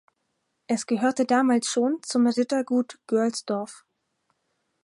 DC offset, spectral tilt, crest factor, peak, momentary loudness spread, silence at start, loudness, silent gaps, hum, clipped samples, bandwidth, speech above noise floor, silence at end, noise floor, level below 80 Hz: under 0.1%; -4 dB/octave; 16 dB; -10 dBFS; 8 LU; 0.7 s; -24 LUFS; none; none; under 0.1%; 11.5 kHz; 52 dB; 1.1 s; -76 dBFS; -78 dBFS